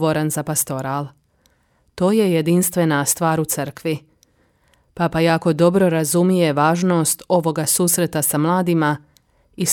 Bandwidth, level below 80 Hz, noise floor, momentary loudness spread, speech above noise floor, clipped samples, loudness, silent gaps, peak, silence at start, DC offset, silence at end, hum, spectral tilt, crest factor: 18.5 kHz; -54 dBFS; -61 dBFS; 8 LU; 43 dB; under 0.1%; -18 LUFS; none; -2 dBFS; 0 s; under 0.1%; 0 s; none; -5 dB/octave; 16 dB